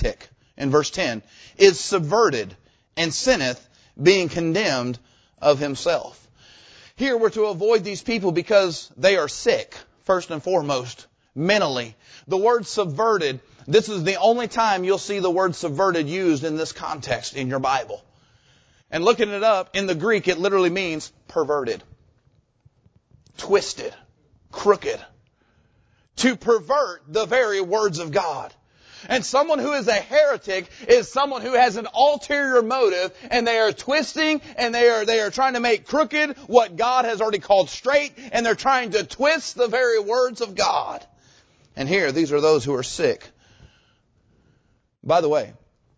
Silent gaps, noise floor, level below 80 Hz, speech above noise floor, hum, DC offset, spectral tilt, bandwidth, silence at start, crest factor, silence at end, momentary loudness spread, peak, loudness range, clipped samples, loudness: none; -64 dBFS; -50 dBFS; 43 dB; none; under 0.1%; -4 dB/octave; 8 kHz; 0 s; 20 dB; 0.45 s; 11 LU; -2 dBFS; 5 LU; under 0.1%; -21 LUFS